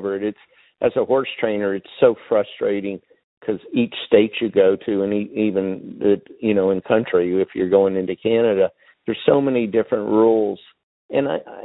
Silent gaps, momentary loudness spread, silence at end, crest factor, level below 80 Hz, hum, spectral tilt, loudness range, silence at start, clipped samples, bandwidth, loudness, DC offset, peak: 3.24-3.41 s, 10.83-11.09 s; 9 LU; 0 s; 20 dB; -60 dBFS; none; -11 dB/octave; 3 LU; 0 s; under 0.1%; 4.1 kHz; -20 LUFS; under 0.1%; 0 dBFS